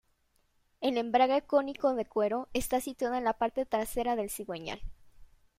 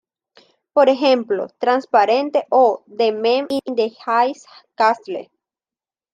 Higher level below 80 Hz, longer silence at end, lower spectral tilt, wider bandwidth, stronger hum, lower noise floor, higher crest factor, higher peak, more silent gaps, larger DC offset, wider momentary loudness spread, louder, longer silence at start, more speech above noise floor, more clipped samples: first, -54 dBFS vs -72 dBFS; second, 0.35 s vs 0.9 s; about the same, -4 dB/octave vs -4.5 dB/octave; first, 16 kHz vs 10 kHz; neither; second, -72 dBFS vs under -90 dBFS; about the same, 20 dB vs 16 dB; second, -12 dBFS vs -2 dBFS; neither; neither; first, 11 LU vs 8 LU; second, -31 LUFS vs -18 LUFS; about the same, 0.8 s vs 0.75 s; second, 41 dB vs over 73 dB; neither